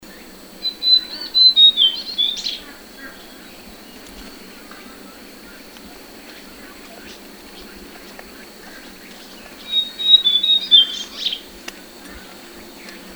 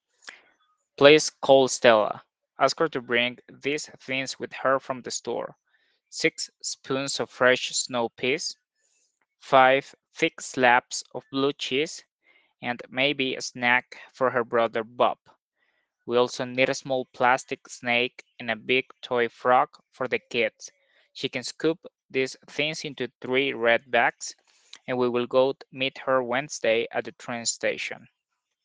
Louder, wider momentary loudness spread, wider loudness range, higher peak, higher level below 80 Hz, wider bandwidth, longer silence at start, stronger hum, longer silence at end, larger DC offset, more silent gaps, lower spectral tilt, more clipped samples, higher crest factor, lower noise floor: first, -13 LUFS vs -25 LUFS; first, 28 LU vs 14 LU; first, 23 LU vs 5 LU; about the same, 0 dBFS vs 0 dBFS; first, -54 dBFS vs -74 dBFS; first, over 20 kHz vs 10 kHz; second, 0.05 s vs 0.25 s; neither; second, 0 s vs 0.65 s; neither; second, none vs 12.12-12.19 s, 15.21-15.25 s, 15.42-15.52 s, 22.05-22.09 s, 23.15-23.21 s; second, -0.5 dB/octave vs -3 dB/octave; neither; about the same, 22 dB vs 26 dB; second, -40 dBFS vs -82 dBFS